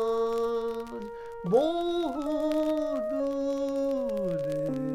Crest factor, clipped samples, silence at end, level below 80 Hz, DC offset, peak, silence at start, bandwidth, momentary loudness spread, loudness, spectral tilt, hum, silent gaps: 16 dB; under 0.1%; 0 s; -56 dBFS; under 0.1%; -12 dBFS; 0 s; 15.5 kHz; 9 LU; -29 LUFS; -7 dB/octave; none; none